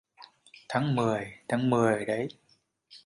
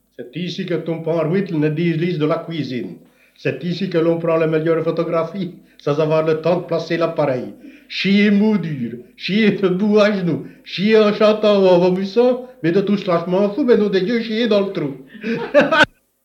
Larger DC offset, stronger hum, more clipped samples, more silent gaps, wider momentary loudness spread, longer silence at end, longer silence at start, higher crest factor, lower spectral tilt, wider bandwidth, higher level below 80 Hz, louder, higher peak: neither; neither; neither; neither; second, 8 LU vs 12 LU; second, 0.1 s vs 0.4 s; about the same, 0.2 s vs 0.2 s; about the same, 20 dB vs 16 dB; about the same, -6.5 dB/octave vs -7 dB/octave; first, 11.5 kHz vs 8.4 kHz; about the same, -66 dBFS vs -62 dBFS; second, -29 LUFS vs -18 LUFS; second, -10 dBFS vs 0 dBFS